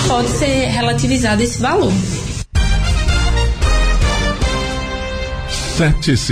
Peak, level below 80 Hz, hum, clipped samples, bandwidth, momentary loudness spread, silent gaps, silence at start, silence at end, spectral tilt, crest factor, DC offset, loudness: -4 dBFS; -18 dBFS; none; under 0.1%; 14.5 kHz; 7 LU; none; 0 s; 0 s; -4.5 dB/octave; 12 dB; under 0.1%; -16 LUFS